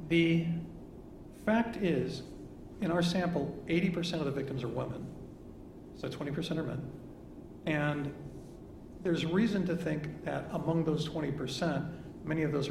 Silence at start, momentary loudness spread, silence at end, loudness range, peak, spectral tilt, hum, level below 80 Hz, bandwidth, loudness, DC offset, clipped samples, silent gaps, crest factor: 0 s; 19 LU; 0 s; 5 LU; -16 dBFS; -6.5 dB/octave; none; -56 dBFS; 13 kHz; -34 LUFS; under 0.1%; under 0.1%; none; 18 dB